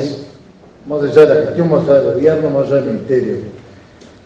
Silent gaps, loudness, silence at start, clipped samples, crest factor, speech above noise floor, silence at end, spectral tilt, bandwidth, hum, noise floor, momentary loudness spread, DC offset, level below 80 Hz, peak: none; -13 LUFS; 0 s; 0.2%; 14 dB; 29 dB; 0.65 s; -8 dB/octave; 7.8 kHz; none; -41 dBFS; 14 LU; under 0.1%; -54 dBFS; 0 dBFS